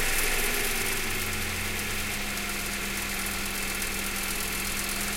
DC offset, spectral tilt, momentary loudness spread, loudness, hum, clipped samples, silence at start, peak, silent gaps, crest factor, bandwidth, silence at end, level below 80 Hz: under 0.1%; -1.5 dB/octave; 4 LU; -28 LUFS; none; under 0.1%; 0 s; -14 dBFS; none; 16 dB; 17 kHz; 0 s; -36 dBFS